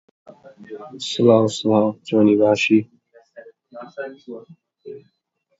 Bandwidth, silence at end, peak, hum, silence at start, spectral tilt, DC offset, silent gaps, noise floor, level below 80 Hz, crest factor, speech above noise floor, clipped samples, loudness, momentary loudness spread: 8 kHz; 0.6 s; -2 dBFS; none; 0.6 s; -6 dB/octave; under 0.1%; none; -45 dBFS; -64 dBFS; 20 dB; 26 dB; under 0.1%; -17 LUFS; 25 LU